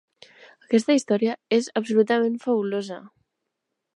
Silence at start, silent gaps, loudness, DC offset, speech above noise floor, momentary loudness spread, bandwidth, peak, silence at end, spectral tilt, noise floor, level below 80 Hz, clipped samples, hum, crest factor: 0.7 s; none; -23 LUFS; under 0.1%; 59 dB; 9 LU; 11 kHz; -6 dBFS; 0.9 s; -5 dB/octave; -81 dBFS; -78 dBFS; under 0.1%; none; 18 dB